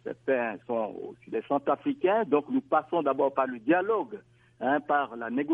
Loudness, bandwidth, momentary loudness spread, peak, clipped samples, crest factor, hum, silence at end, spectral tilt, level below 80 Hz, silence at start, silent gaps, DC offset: -28 LUFS; 3.8 kHz; 10 LU; -12 dBFS; under 0.1%; 16 dB; none; 0 s; -8.5 dB/octave; -76 dBFS; 0.05 s; none; under 0.1%